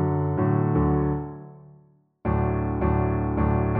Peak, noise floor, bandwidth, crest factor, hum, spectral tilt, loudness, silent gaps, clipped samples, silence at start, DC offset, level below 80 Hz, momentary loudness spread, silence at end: -10 dBFS; -57 dBFS; 3.2 kHz; 14 dB; none; -13.5 dB/octave; -24 LUFS; none; under 0.1%; 0 s; under 0.1%; -34 dBFS; 9 LU; 0 s